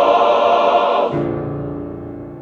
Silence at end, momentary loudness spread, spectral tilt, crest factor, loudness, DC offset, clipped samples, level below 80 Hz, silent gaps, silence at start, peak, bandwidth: 0 s; 16 LU; -7 dB/octave; 14 dB; -16 LUFS; under 0.1%; under 0.1%; -46 dBFS; none; 0 s; -2 dBFS; 7.2 kHz